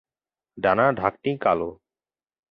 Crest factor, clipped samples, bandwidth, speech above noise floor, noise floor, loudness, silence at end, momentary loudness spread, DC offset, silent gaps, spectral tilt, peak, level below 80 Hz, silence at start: 22 dB; under 0.1%; 5.6 kHz; over 68 dB; under -90 dBFS; -23 LUFS; 0.75 s; 6 LU; under 0.1%; none; -9 dB/octave; -4 dBFS; -56 dBFS; 0.55 s